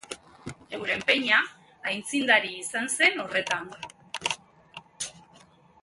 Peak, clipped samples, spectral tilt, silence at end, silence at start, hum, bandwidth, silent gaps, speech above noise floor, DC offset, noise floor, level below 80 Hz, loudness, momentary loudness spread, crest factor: -6 dBFS; under 0.1%; -1.5 dB/octave; 0.65 s; 0.1 s; none; 12 kHz; none; 30 dB; under 0.1%; -56 dBFS; -68 dBFS; -26 LUFS; 21 LU; 22 dB